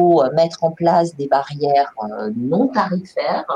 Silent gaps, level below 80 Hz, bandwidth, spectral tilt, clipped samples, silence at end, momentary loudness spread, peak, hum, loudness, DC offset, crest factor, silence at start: none; -62 dBFS; 9.4 kHz; -7 dB/octave; under 0.1%; 0 s; 8 LU; -4 dBFS; none; -18 LUFS; under 0.1%; 14 dB; 0 s